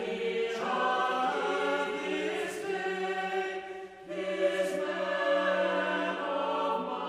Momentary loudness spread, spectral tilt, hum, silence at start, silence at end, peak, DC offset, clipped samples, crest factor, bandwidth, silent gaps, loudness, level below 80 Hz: 6 LU; -4 dB/octave; none; 0 s; 0 s; -16 dBFS; under 0.1%; under 0.1%; 14 dB; 15 kHz; none; -31 LUFS; -74 dBFS